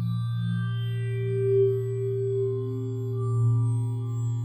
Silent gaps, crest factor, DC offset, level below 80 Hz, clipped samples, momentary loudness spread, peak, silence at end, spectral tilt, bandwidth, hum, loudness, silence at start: none; 12 dB; under 0.1%; -58 dBFS; under 0.1%; 6 LU; -14 dBFS; 0 s; -9 dB/octave; 8.8 kHz; none; -27 LUFS; 0 s